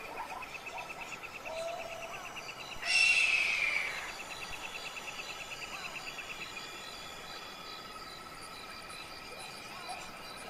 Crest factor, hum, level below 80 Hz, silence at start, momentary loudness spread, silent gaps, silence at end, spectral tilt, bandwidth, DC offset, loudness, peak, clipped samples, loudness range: 22 dB; none; -62 dBFS; 0 s; 17 LU; none; 0 s; -0.5 dB/octave; 16 kHz; under 0.1%; -35 LUFS; -16 dBFS; under 0.1%; 13 LU